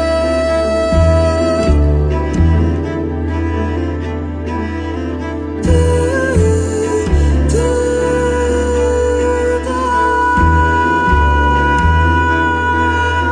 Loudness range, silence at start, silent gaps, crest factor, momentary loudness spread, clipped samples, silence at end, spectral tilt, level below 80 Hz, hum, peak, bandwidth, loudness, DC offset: 5 LU; 0 s; none; 12 dB; 8 LU; under 0.1%; 0 s; -6.5 dB/octave; -20 dBFS; none; 0 dBFS; 10 kHz; -14 LUFS; under 0.1%